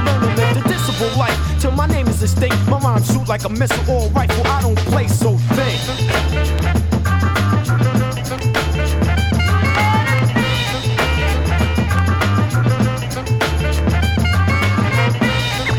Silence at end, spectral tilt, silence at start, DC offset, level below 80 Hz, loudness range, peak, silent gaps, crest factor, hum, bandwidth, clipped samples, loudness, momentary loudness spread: 0 s; -5.5 dB/octave; 0 s; under 0.1%; -24 dBFS; 1 LU; -2 dBFS; none; 14 dB; none; 18.5 kHz; under 0.1%; -16 LUFS; 3 LU